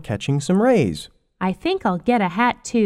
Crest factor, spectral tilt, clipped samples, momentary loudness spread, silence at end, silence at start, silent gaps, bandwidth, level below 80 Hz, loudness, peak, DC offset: 14 dB; -6 dB/octave; under 0.1%; 9 LU; 0 s; 0 s; none; 12.5 kHz; -50 dBFS; -20 LUFS; -4 dBFS; under 0.1%